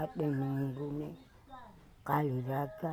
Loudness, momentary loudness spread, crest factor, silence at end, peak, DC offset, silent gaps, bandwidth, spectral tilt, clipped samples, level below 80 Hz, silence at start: -36 LUFS; 21 LU; 20 dB; 0 s; -16 dBFS; under 0.1%; none; 17.5 kHz; -9 dB/octave; under 0.1%; -64 dBFS; 0 s